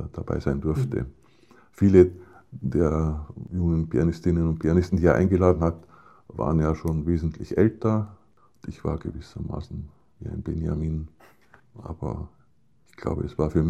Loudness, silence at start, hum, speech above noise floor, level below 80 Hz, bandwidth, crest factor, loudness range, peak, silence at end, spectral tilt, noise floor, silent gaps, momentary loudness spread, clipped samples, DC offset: -25 LUFS; 0 s; none; 41 dB; -38 dBFS; 8.8 kHz; 22 dB; 10 LU; -2 dBFS; 0 s; -9.5 dB/octave; -64 dBFS; none; 19 LU; under 0.1%; 0.1%